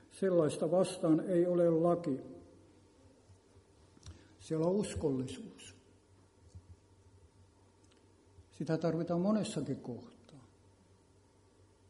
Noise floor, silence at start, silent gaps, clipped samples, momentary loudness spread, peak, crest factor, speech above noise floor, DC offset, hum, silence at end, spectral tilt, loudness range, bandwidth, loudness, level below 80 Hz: -66 dBFS; 0.15 s; none; under 0.1%; 25 LU; -16 dBFS; 20 dB; 33 dB; under 0.1%; none; 1.5 s; -7 dB/octave; 10 LU; 11.5 kHz; -34 LUFS; -66 dBFS